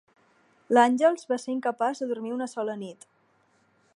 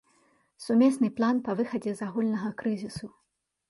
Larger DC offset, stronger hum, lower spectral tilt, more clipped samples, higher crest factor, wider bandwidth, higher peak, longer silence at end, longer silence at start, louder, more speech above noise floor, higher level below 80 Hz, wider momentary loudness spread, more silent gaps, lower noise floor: neither; neither; second, -4.5 dB/octave vs -6.5 dB/octave; neither; first, 22 dB vs 16 dB; about the same, 11.5 kHz vs 11.5 kHz; first, -6 dBFS vs -12 dBFS; first, 1 s vs 0.6 s; about the same, 0.7 s vs 0.6 s; about the same, -26 LUFS vs -28 LUFS; about the same, 41 dB vs 40 dB; second, -84 dBFS vs -66 dBFS; second, 12 LU vs 17 LU; neither; about the same, -66 dBFS vs -67 dBFS